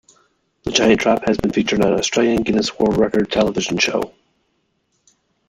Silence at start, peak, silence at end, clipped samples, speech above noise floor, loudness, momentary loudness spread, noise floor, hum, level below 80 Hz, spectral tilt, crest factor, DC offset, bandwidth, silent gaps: 0.65 s; -2 dBFS; 1.4 s; under 0.1%; 50 dB; -17 LUFS; 5 LU; -67 dBFS; none; -44 dBFS; -4 dB/octave; 18 dB; under 0.1%; 15 kHz; none